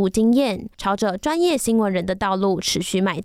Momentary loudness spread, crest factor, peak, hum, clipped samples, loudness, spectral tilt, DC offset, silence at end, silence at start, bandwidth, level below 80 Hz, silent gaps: 5 LU; 12 dB; -8 dBFS; none; under 0.1%; -20 LUFS; -4.5 dB/octave; under 0.1%; 0 s; 0 s; 15.5 kHz; -46 dBFS; none